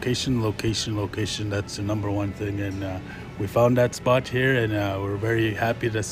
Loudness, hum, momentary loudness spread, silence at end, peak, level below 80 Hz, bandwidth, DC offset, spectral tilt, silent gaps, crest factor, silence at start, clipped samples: -25 LUFS; none; 8 LU; 0 s; -8 dBFS; -48 dBFS; 15.5 kHz; under 0.1%; -5.5 dB/octave; none; 18 dB; 0 s; under 0.1%